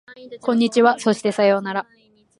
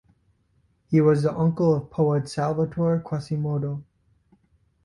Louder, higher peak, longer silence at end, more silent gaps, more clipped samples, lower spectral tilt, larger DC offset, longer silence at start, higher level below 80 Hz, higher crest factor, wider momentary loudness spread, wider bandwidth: first, -19 LUFS vs -24 LUFS; first, -2 dBFS vs -8 dBFS; second, 0.55 s vs 1 s; neither; neither; second, -5 dB/octave vs -8.5 dB/octave; neither; second, 0.1 s vs 0.9 s; second, -70 dBFS vs -56 dBFS; about the same, 18 dB vs 16 dB; first, 11 LU vs 8 LU; about the same, 11.5 kHz vs 11.5 kHz